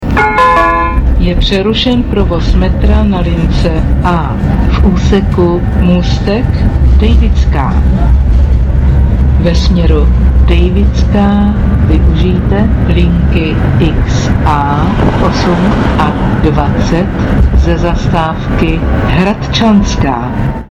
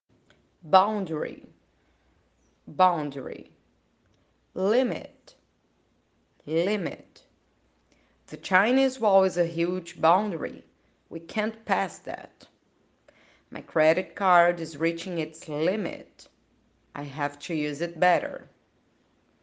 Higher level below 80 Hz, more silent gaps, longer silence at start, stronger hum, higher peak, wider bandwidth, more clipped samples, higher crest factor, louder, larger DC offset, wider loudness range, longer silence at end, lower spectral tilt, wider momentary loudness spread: first, -12 dBFS vs -72 dBFS; neither; second, 0 s vs 0.65 s; neither; first, 0 dBFS vs -4 dBFS; second, 7.4 kHz vs 9.4 kHz; neither; second, 8 dB vs 24 dB; first, -10 LUFS vs -26 LUFS; neither; second, 1 LU vs 8 LU; second, 0.05 s vs 1.05 s; first, -7.5 dB/octave vs -5.5 dB/octave; second, 3 LU vs 20 LU